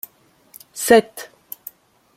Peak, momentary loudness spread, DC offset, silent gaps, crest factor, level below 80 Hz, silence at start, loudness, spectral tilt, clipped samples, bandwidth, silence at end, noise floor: -2 dBFS; 23 LU; under 0.1%; none; 20 dB; -60 dBFS; 0.75 s; -16 LUFS; -3 dB/octave; under 0.1%; 16.5 kHz; 0.9 s; -54 dBFS